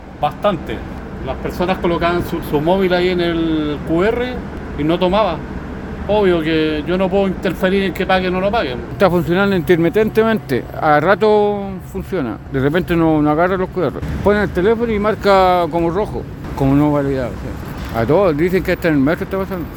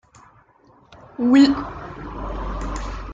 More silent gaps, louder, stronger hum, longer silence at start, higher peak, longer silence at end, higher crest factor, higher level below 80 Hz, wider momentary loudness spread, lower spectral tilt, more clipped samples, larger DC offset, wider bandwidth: neither; first, -16 LUFS vs -20 LUFS; neither; second, 0 s vs 0.9 s; first, 0 dBFS vs -4 dBFS; about the same, 0 s vs 0 s; about the same, 16 dB vs 18 dB; about the same, -34 dBFS vs -34 dBFS; second, 11 LU vs 20 LU; first, -7.5 dB/octave vs -6 dB/octave; neither; neither; first, 18 kHz vs 7.8 kHz